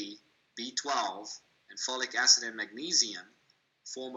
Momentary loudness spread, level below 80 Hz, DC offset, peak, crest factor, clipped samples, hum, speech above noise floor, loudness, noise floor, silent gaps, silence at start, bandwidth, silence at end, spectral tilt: 22 LU; -88 dBFS; under 0.1%; -8 dBFS; 24 dB; under 0.1%; none; 39 dB; -28 LUFS; -70 dBFS; none; 0 s; 18 kHz; 0 s; 1 dB/octave